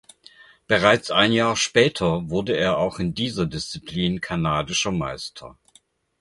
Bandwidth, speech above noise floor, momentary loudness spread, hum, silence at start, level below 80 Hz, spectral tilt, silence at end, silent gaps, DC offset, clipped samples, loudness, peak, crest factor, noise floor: 11.5 kHz; 37 dB; 12 LU; none; 0.7 s; -48 dBFS; -4 dB/octave; 0.7 s; none; under 0.1%; under 0.1%; -22 LUFS; -2 dBFS; 22 dB; -59 dBFS